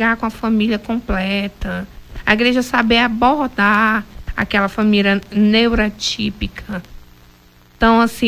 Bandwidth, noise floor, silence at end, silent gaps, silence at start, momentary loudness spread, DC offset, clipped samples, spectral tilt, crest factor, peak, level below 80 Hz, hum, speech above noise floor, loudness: 15.5 kHz; -48 dBFS; 0 s; none; 0 s; 13 LU; under 0.1%; under 0.1%; -5 dB/octave; 16 dB; 0 dBFS; -34 dBFS; 60 Hz at -45 dBFS; 32 dB; -16 LUFS